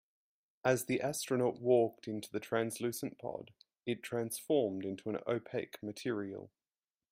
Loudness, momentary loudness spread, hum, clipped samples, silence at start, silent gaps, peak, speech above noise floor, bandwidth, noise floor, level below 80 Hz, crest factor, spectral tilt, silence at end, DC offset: -36 LUFS; 13 LU; none; under 0.1%; 0.65 s; none; -16 dBFS; over 54 dB; 16 kHz; under -90 dBFS; -78 dBFS; 20 dB; -5 dB/octave; 0.65 s; under 0.1%